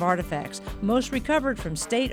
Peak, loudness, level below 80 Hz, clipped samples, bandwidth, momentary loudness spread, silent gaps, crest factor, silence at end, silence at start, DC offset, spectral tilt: -10 dBFS; -26 LUFS; -42 dBFS; under 0.1%; 19 kHz; 7 LU; none; 16 dB; 0 s; 0 s; under 0.1%; -4.5 dB/octave